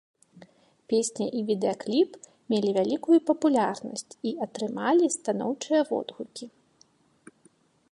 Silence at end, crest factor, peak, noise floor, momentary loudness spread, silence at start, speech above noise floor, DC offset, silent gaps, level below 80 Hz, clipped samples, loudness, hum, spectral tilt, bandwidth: 1.45 s; 18 dB; -10 dBFS; -63 dBFS; 13 LU; 0.9 s; 37 dB; under 0.1%; none; -78 dBFS; under 0.1%; -27 LUFS; none; -4.5 dB/octave; 11.5 kHz